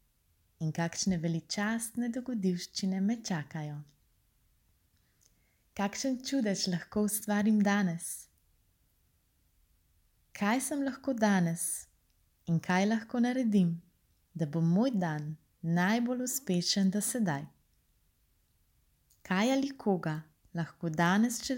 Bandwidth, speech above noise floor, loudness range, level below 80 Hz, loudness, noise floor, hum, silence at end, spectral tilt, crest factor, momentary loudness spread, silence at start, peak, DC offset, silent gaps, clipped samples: 17 kHz; 41 dB; 6 LU; -68 dBFS; -32 LUFS; -72 dBFS; none; 0 s; -5 dB/octave; 18 dB; 12 LU; 0.6 s; -14 dBFS; under 0.1%; none; under 0.1%